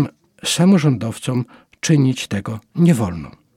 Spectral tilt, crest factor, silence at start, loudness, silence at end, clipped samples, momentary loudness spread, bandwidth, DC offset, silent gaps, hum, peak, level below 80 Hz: -5.5 dB/octave; 14 dB; 0 s; -18 LUFS; 0.25 s; under 0.1%; 12 LU; 15.5 kHz; under 0.1%; none; none; -4 dBFS; -50 dBFS